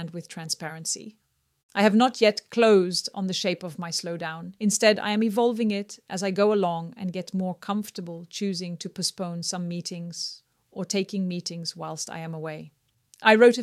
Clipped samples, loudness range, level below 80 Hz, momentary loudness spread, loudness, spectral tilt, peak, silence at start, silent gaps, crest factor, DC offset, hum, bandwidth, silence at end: under 0.1%; 8 LU; -74 dBFS; 15 LU; -25 LUFS; -4 dB/octave; -2 dBFS; 0 s; 1.63-1.69 s; 24 dB; under 0.1%; none; 14.5 kHz; 0 s